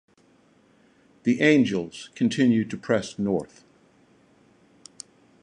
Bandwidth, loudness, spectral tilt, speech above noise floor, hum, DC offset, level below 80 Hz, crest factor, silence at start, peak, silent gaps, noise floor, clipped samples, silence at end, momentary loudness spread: 10.5 kHz; -23 LUFS; -6 dB/octave; 37 dB; none; under 0.1%; -64 dBFS; 20 dB; 1.25 s; -6 dBFS; none; -60 dBFS; under 0.1%; 1.95 s; 24 LU